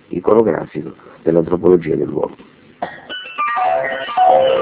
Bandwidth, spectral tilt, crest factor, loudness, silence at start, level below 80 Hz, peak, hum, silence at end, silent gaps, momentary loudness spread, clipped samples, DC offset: 4 kHz; -10 dB/octave; 16 dB; -16 LUFS; 0.1 s; -48 dBFS; 0 dBFS; none; 0 s; none; 16 LU; under 0.1%; under 0.1%